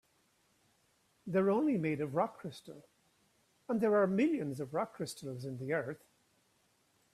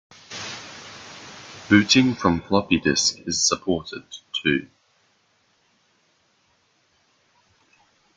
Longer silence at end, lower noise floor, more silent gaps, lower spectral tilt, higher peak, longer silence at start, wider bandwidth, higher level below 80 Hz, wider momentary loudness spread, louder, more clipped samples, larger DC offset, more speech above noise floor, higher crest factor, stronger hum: second, 1.2 s vs 3.5 s; first, -74 dBFS vs -65 dBFS; neither; first, -7 dB/octave vs -3.5 dB/octave; second, -18 dBFS vs -2 dBFS; first, 1.25 s vs 0.3 s; first, 14.5 kHz vs 9.6 kHz; second, -76 dBFS vs -56 dBFS; second, 18 LU vs 22 LU; second, -34 LUFS vs -21 LUFS; neither; neither; second, 40 dB vs 44 dB; about the same, 18 dB vs 22 dB; neither